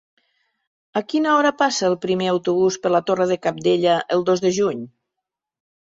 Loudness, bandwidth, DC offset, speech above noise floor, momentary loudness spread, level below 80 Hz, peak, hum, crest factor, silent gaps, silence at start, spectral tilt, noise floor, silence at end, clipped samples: -20 LUFS; 7.8 kHz; under 0.1%; 64 dB; 6 LU; -64 dBFS; -4 dBFS; none; 16 dB; none; 0.95 s; -4.5 dB/octave; -83 dBFS; 1.1 s; under 0.1%